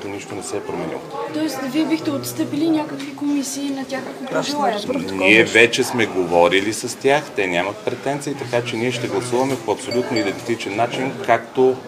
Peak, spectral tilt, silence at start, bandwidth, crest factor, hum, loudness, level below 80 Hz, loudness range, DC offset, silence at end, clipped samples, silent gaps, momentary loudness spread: 0 dBFS; -4 dB/octave; 0 s; 16 kHz; 20 dB; none; -20 LUFS; -64 dBFS; 6 LU; under 0.1%; 0 s; under 0.1%; none; 12 LU